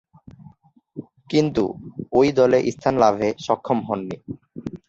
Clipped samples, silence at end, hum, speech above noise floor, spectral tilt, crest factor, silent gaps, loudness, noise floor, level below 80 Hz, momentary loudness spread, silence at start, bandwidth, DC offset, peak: under 0.1%; 0.15 s; none; 33 dB; -6.5 dB/octave; 18 dB; none; -20 LUFS; -52 dBFS; -54 dBFS; 20 LU; 0.4 s; 7.8 kHz; under 0.1%; -4 dBFS